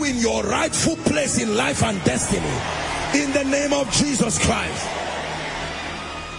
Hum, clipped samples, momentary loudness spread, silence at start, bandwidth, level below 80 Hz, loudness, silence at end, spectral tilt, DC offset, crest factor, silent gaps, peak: none; under 0.1%; 8 LU; 0 s; 11 kHz; -42 dBFS; -21 LUFS; 0 s; -3.5 dB/octave; under 0.1%; 18 dB; none; -4 dBFS